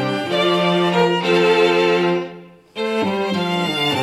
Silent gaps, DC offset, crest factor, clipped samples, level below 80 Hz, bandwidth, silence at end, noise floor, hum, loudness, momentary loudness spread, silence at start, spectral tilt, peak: none; under 0.1%; 14 dB; under 0.1%; -62 dBFS; 14.5 kHz; 0 s; -39 dBFS; none; -17 LUFS; 9 LU; 0 s; -5.5 dB/octave; -4 dBFS